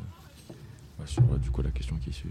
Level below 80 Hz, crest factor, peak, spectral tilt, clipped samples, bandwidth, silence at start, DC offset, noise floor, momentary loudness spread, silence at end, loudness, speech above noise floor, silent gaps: -36 dBFS; 20 dB; -10 dBFS; -7.5 dB/octave; under 0.1%; 10.5 kHz; 0 s; under 0.1%; -48 dBFS; 22 LU; 0 s; -29 LUFS; 21 dB; none